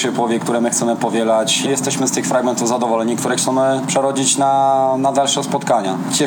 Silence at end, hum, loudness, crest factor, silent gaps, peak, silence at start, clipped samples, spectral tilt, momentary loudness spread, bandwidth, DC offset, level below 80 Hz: 0 s; none; -16 LUFS; 14 dB; none; -2 dBFS; 0 s; under 0.1%; -3.5 dB/octave; 4 LU; 19.5 kHz; under 0.1%; -84 dBFS